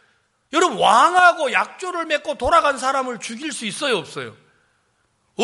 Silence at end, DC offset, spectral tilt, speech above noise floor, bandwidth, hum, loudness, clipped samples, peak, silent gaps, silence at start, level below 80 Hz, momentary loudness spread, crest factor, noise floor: 0 s; under 0.1%; -2.5 dB/octave; 47 dB; 11.5 kHz; none; -18 LUFS; under 0.1%; -2 dBFS; none; 0.55 s; -50 dBFS; 15 LU; 18 dB; -66 dBFS